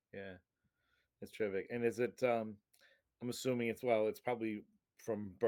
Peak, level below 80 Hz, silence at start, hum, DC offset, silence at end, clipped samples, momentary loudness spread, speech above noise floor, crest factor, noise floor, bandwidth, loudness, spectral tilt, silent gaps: -20 dBFS; -82 dBFS; 0.15 s; none; under 0.1%; 0 s; under 0.1%; 16 LU; 43 dB; 20 dB; -82 dBFS; 18 kHz; -39 LUFS; -5.5 dB/octave; none